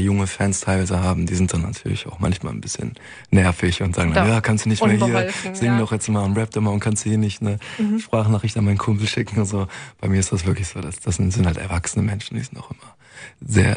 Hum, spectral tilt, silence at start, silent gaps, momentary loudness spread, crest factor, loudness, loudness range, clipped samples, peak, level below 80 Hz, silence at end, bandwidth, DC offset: none; -5.5 dB/octave; 0 s; none; 10 LU; 18 dB; -21 LUFS; 4 LU; under 0.1%; -2 dBFS; -40 dBFS; 0 s; 10.5 kHz; under 0.1%